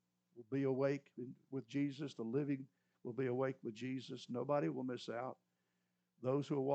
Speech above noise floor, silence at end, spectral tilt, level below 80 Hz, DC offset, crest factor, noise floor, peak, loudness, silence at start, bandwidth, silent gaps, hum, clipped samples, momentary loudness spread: 45 dB; 0 s; -7.5 dB/octave; under -90 dBFS; under 0.1%; 18 dB; -85 dBFS; -24 dBFS; -42 LUFS; 0.35 s; 8.4 kHz; none; 60 Hz at -70 dBFS; under 0.1%; 11 LU